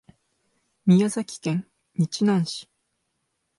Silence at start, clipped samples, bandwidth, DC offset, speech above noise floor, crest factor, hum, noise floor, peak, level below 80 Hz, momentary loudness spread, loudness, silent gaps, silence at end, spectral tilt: 0.85 s; under 0.1%; 11.5 kHz; under 0.1%; 54 dB; 18 dB; none; -76 dBFS; -8 dBFS; -70 dBFS; 11 LU; -24 LUFS; none; 0.95 s; -6.5 dB/octave